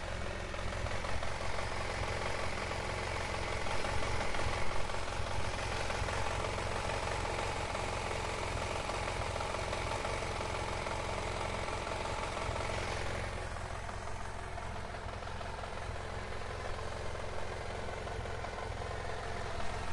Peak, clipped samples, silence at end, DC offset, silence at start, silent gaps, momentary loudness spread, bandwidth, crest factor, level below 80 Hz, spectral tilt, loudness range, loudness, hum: -22 dBFS; under 0.1%; 0 s; under 0.1%; 0 s; none; 6 LU; 11.5 kHz; 16 dB; -44 dBFS; -4 dB/octave; 5 LU; -38 LUFS; none